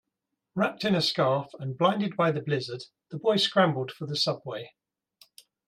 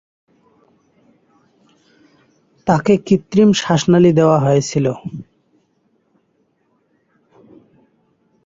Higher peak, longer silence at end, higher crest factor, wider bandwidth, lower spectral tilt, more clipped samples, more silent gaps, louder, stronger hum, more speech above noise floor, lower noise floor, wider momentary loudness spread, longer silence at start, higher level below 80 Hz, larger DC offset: second, -10 dBFS vs -2 dBFS; second, 1 s vs 3.25 s; about the same, 20 dB vs 18 dB; first, 15 kHz vs 7.8 kHz; about the same, -5.5 dB/octave vs -6.5 dB/octave; neither; neither; second, -27 LUFS vs -14 LUFS; neither; first, 57 dB vs 49 dB; first, -84 dBFS vs -63 dBFS; about the same, 15 LU vs 14 LU; second, 0.55 s vs 2.65 s; second, -72 dBFS vs -54 dBFS; neither